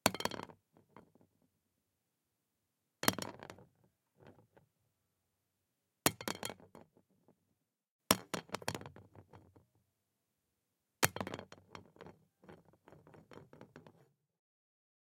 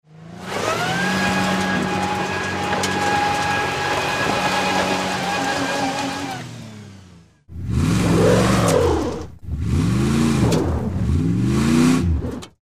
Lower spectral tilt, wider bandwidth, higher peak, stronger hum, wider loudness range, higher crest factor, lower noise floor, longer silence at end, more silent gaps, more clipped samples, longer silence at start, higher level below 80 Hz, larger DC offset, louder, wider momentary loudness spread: second, -2.5 dB/octave vs -5 dB/octave; about the same, 16.5 kHz vs 15.5 kHz; about the same, -4 dBFS vs -4 dBFS; neither; about the same, 4 LU vs 4 LU; first, 42 dB vs 16 dB; first, -86 dBFS vs -47 dBFS; first, 1.1 s vs 0.15 s; first, 7.91-7.99 s vs none; neither; about the same, 0.05 s vs 0.1 s; second, -78 dBFS vs -34 dBFS; neither; second, -38 LUFS vs -20 LUFS; first, 27 LU vs 13 LU